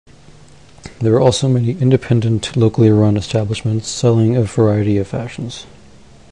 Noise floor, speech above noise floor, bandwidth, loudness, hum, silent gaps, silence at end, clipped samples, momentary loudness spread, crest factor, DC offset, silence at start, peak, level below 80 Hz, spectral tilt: -43 dBFS; 29 dB; 10.5 kHz; -15 LUFS; none; none; 0.65 s; under 0.1%; 11 LU; 16 dB; 0.5%; 0.85 s; 0 dBFS; -42 dBFS; -7 dB/octave